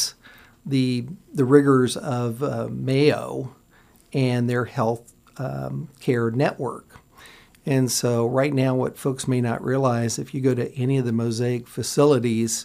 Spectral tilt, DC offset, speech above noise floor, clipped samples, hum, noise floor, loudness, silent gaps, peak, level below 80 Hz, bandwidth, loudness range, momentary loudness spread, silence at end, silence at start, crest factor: -5.5 dB/octave; under 0.1%; 33 dB; under 0.1%; none; -55 dBFS; -23 LUFS; none; -2 dBFS; -60 dBFS; 15.5 kHz; 4 LU; 13 LU; 0 s; 0 s; 20 dB